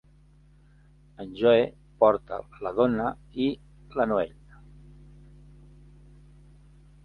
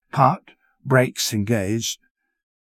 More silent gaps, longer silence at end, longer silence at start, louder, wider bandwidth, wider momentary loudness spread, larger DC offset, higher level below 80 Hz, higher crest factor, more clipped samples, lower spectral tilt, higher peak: neither; first, 2.75 s vs 0.85 s; first, 1.2 s vs 0.15 s; second, -26 LUFS vs -21 LUFS; second, 5 kHz vs 16 kHz; first, 16 LU vs 13 LU; neither; about the same, -54 dBFS vs -52 dBFS; about the same, 22 dB vs 20 dB; neither; first, -8 dB/octave vs -4.5 dB/octave; second, -6 dBFS vs -2 dBFS